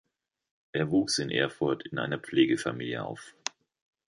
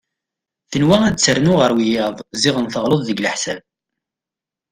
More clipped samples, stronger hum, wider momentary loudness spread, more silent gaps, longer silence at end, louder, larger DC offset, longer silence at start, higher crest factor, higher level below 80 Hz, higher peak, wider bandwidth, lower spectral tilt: neither; neither; first, 12 LU vs 9 LU; neither; second, 0.8 s vs 1.1 s; second, -30 LUFS vs -16 LUFS; neither; about the same, 0.75 s vs 0.7 s; about the same, 20 dB vs 18 dB; second, -66 dBFS vs -50 dBFS; second, -10 dBFS vs 0 dBFS; second, 11.5 kHz vs 15.5 kHz; about the same, -4.5 dB/octave vs -4.5 dB/octave